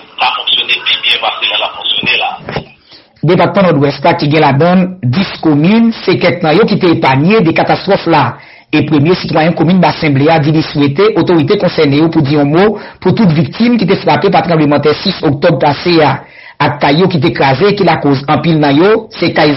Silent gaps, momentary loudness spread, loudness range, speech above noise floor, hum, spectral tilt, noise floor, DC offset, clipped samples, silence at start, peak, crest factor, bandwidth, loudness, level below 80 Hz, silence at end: none; 4 LU; 2 LU; 32 dB; none; -8.5 dB/octave; -40 dBFS; under 0.1%; under 0.1%; 0.2 s; 0 dBFS; 10 dB; 6 kHz; -9 LUFS; -42 dBFS; 0 s